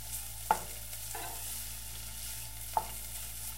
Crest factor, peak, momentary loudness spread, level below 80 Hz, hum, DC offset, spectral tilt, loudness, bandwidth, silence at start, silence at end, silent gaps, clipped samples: 28 dB; -12 dBFS; 7 LU; -50 dBFS; none; 0.4%; -1.5 dB/octave; -38 LUFS; 16 kHz; 0 s; 0 s; none; under 0.1%